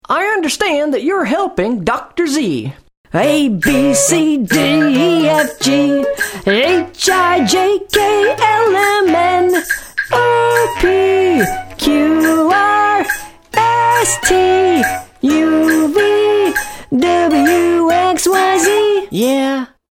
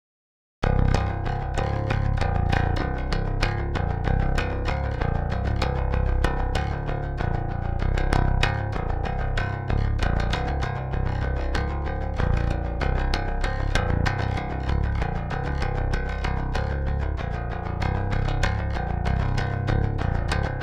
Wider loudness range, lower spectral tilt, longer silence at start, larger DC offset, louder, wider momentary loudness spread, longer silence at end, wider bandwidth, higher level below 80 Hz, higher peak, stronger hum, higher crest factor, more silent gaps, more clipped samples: about the same, 2 LU vs 2 LU; second, -3.5 dB/octave vs -6.5 dB/octave; second, 0.1 s vs 0.6 s; neither; first, -13 LUFS vs -26 LUFS; about the same, 6 LU vs 4 LU; first, 0.25 s vs 0 s; first, 18.5 kHz vs 10 kHz; second, -40 dBFS vs -26 dBFS; first, 0 dBFS vs -4 dBFS; neither; second, 12 dB vs 20 dB; first, 2.97-3.04 s vs none; neither